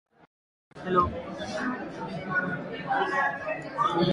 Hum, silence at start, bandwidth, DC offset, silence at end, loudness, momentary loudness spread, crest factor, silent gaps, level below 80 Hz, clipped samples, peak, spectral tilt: none; 0.75 s; 11 kHz; under 0.1%; 0 s; -29 LUFS; 10 LU; 20 dB; none; -52 dBFS; under 0.1%; -10 dBFS; -6 dB/octave